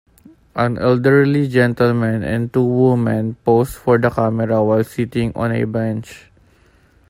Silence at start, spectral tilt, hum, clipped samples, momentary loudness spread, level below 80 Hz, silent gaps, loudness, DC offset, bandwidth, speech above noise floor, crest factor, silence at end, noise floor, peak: 0.55 s; -8 dB/octave; none; under 0.1%; 7 LU; -46 dBFS; none; -17 LUFS; under 0.1%; 16 kHz; 36 dB; 16 dB; 0.9 s; -52 dBFS; 0 dBFS